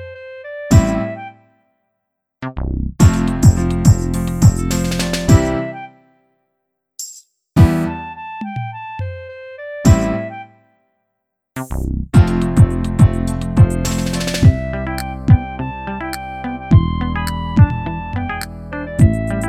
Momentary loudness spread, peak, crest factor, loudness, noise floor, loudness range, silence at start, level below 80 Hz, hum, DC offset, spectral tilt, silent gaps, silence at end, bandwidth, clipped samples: 17 LU; 0 dBFS; 16 dB; -16 LUFS; -75 dBFS; 6 LU; 0 s; -26 dBFS; none; under 0.1%; -6.5 dB/octave; none; 0 s; 15 kHz; under 0.1%